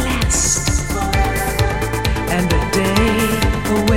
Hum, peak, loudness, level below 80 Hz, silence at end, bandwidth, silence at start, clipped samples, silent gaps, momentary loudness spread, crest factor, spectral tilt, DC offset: none; 0 dBFS; -17 LUFS; -22 dBFS; 0 s; 17 kHz; 0 s; under 0.1%; none; 4 LU; 16 dB; -4 dB/octave; 1%